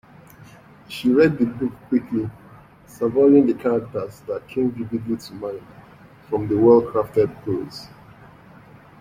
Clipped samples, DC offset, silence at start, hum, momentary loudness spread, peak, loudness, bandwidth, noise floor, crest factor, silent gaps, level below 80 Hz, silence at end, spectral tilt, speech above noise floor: under 0.1%; under 0.1%; 0.9 s; none; 17 LU; -2 dBFS; -21 LUFS; 15.5 kHz; -47 dBFS; 18 dB; none; -56 dBFS; 1.15 s; -8 dB/octave; 27 dB